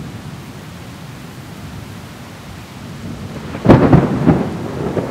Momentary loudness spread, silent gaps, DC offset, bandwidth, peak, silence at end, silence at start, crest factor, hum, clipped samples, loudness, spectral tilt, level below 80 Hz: 22 LU; none; under 0.1%; 16 kHz; 0 dBFS; 0 s; 0 s; 18 dB; none; 0.2%; -14 LUFS; -8 dB/octave; -36 dBFS